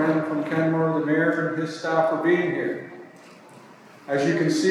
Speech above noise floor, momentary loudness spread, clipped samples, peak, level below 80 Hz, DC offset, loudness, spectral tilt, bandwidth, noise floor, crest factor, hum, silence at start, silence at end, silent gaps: 25 dB; 10 LU; under 0.1%; -8 dBFS; -82 dBFS; under 0.1%; -23 LUFS; -6 dB/octave; 12 kHz; -47 dBFS; 16 dB; none; 0 s; 0 s; none